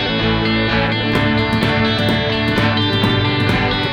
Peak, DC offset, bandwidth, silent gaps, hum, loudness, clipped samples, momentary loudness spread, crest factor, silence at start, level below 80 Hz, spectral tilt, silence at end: -2 dBFS; under 0.1%; 12.5 kHz; none; none; -16 LUFS; under 0.1%; 1 LU; 14 dB; 0 s; -32 dBFS; -6.5 dB/octave; 0 s